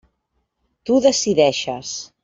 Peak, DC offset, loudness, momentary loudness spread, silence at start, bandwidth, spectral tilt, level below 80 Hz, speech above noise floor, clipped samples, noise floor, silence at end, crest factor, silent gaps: -4 dBFS; under 0.1%; -18 LUFS; 13 LU; 0.85 s; 8 kHz; -3.5 dB/octave; -58 dBFS; 53 dB; under 0.1%; -72 dBFS; 0.2 s; 18 dB; none